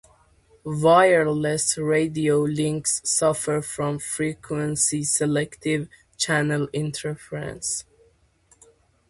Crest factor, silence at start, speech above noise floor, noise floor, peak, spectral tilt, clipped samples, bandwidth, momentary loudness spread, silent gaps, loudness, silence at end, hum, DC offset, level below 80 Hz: 20 dB; 0.65 s; 38 dB; -60 dBFS; -4 dBFS; -4 dB/octave; under 0.1%; 12 kHz; 12 LU; none; -23 LUFS; 1.25 s; none; under 0.1%; -58 dBFS